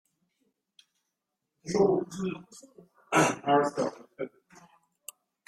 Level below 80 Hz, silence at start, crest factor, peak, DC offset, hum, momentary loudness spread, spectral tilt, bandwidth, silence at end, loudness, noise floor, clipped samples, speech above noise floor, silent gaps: -68 dBFS; 1.65 s; 22 dB; -10 dBFS; under 0.1%; none; 22 LU; -5 dB/octave; 16 kHz; 1.2 s; -28 LUFS; -84 dBFS; under 0.1%; 56 dB; none